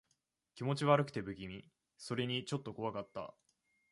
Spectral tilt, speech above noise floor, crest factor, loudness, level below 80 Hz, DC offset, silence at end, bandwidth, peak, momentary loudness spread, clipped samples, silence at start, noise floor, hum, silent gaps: -6 dB/octave; 45 dB; 24 dB; -38 LUFS; -70 dBFS; under 0.1%; 0.6 s; 11.5 kHz; -14 dBFS; 18 LU; under 0.1%; 0.55 s; -82 dBFS; none; none